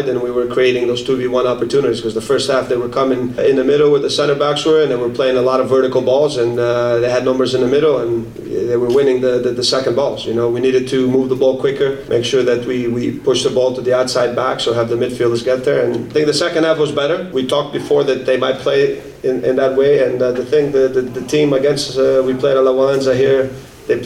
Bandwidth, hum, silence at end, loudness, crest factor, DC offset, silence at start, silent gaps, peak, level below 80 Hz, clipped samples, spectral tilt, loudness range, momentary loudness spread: 13 kHz; none; 0 s; -15 LUFS; 12 dB; under 0.1%; 0 s; none; -2 dBFS; -48 dBFS; under 0.1%; -5 dB/octave; 2 LU; 5 LU